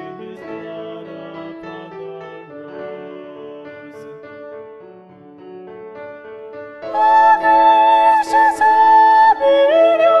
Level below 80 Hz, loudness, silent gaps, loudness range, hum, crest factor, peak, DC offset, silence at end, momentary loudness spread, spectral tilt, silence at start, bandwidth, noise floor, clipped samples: -62 dBFS; -12 LUFS; none; 24 LU; none; 14 dB; -2 dBFS; under 0.1%; 0 s; 24 LU; -4 dB/octave; 0 s; 11 kHz; -41 dBFS; under 0.1%